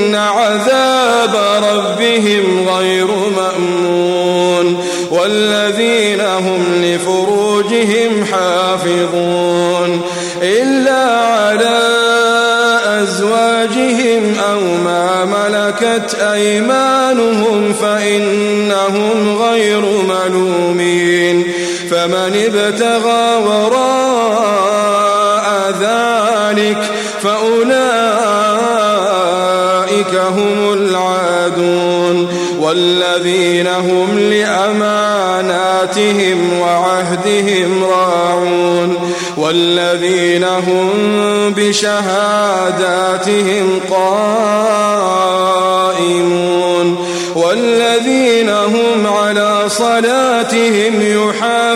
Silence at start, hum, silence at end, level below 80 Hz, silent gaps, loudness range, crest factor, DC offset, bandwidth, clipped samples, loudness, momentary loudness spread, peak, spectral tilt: 0 s; none; 0 s; -60 dBFS; none; 1 LU; 12 dB; under 0.1%; 16 kHz; under 0.1%; -12 LUFS; 3 LU; 0 dBFS; -4 dB/octave